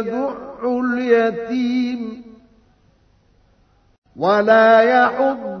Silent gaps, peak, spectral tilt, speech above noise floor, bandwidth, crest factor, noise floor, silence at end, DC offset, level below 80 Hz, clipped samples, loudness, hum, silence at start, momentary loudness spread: 3.98-4.02 s; -2 dBFS; -6.5 dB/octave; 40 dB; 6.4 kHz; 16 dB; -56 dBFS; 0 s; under 0.1%; -58 dBFS; under 0.1%; -17 LUFS; none; 0 s; 15 LU